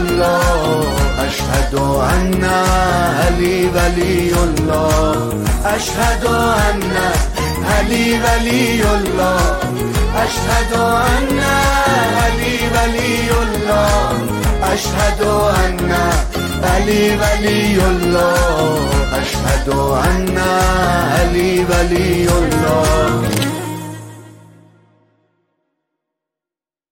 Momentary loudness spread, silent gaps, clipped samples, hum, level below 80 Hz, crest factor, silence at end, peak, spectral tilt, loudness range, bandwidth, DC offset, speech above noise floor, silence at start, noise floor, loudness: 4 LU; none; under 0.1%; none; -22 dBFS; 12 dB; 2.6 s; -2 dBFS; -5 dB/octave; 1 LU; 17 kHz; under 0.1%; 75 dB; 0 s; -89 dBFS; -15 LUFS